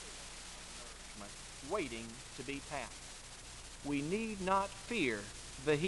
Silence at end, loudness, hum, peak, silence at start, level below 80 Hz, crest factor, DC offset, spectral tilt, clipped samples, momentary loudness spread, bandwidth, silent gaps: 0 s; -41 LUFS; 60 Hz at -60 dBFS; -20 dBFS; 0 s; -58 dBFS; 22 dB; under 0.1%; -4 dB/octave; under 0.1%; 14 LU; 11.5 kHz; none